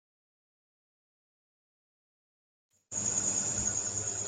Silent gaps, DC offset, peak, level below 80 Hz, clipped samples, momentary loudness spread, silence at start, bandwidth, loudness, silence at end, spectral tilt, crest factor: none; under 0.1%; -18 dBFS; -62 dBFS; under 0.1%; 5 LU; 2.9 s; 10 kHz; -30 LUFS; 0 s; -2 dB/octave; 20 dB